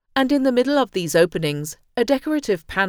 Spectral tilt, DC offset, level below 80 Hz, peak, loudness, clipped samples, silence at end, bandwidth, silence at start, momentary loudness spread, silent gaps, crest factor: -5 dB/octave; under 0.1%; -50 dBFS; -4 dBFS; -20 LUFS; under 0.1%; 0 s; over 20 kHz; 0.15 s; 7 LU; none; 16 dB